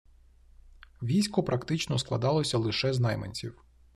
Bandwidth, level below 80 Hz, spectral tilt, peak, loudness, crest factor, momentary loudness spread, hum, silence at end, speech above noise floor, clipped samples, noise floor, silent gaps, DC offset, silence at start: 13 kHz; -56 dBFS; -5.5 dB/octave; -12 dBFS; -29 LUFS; 18 dB; 11 LU; none; 0.45 s; 29 dB; under 0.1%; -57 dBFS; none; under 0.1%; 0.65 s